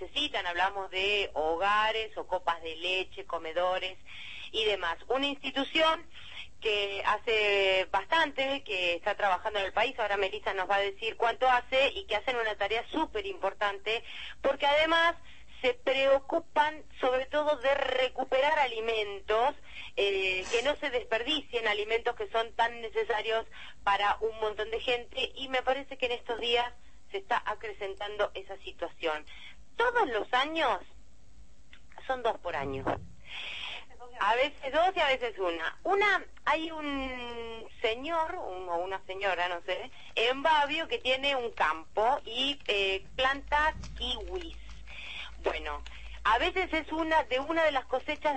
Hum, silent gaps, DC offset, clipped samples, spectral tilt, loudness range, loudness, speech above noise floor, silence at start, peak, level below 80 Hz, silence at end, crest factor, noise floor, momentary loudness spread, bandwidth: none; none; 0.5%; under 0.1%; -3 dB/octave; 5 LU; -30 LUFS; 27 dB; 0 s; -14 dBFS; -54 dBFS; 0 s; 16 dB; -58 dBFS; 12 LU; 8.8 kHz